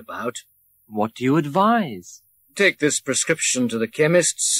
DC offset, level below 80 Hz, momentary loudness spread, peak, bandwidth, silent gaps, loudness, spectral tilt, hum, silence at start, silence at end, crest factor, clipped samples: under 0.1%; -68 dBFS; 14 LU; -4 dBFS; 16 kHz; none; -20 LUFS; -3.5 dB/octave; none; 0 s; 0 s; 16 dB; under 0.1%